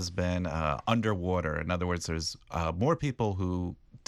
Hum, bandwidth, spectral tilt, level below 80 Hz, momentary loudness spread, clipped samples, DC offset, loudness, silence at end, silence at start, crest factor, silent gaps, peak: none; 13 kHz; -6 dB/octave; -46 dBFS; 5 LU; under 0.1%; under 0.1%; -31 LUFS; 0.1 s; 0 s; 20 dB; none; -10 dBFS